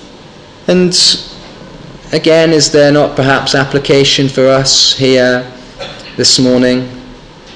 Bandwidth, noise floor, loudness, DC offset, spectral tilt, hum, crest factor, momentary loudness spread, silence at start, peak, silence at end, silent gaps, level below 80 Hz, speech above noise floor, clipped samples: 10.5 kHz; -34 dBFS; -9 LUFS; 0.3%; -3.5 dB/octave; none; 10 dB; 17 LU; 0 s; 0 dBFS; 0 s; none; -40 dBFS; 26 dB; under 0.1%